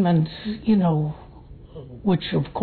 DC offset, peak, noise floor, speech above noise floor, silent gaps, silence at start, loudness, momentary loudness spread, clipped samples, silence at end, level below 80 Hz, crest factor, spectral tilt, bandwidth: under 0.1%; -10 dBFS; -43 dBFS; 22 dB; none; 0 s; -23 LUFS; 21 LU; under 0.1%; 0 s; -48 dBFS; 12 dB; -11 dB/octave; 4.5 kHz